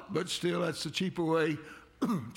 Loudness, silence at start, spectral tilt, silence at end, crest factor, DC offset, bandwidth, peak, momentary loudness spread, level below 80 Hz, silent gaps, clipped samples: -32 LUFS; 0 s; -5 dB/octave; 0 s; 14 dB; under 0.1%; 17 kHz; -18 dBFS; 7 LU; -68 dBFS; none; under 0.1%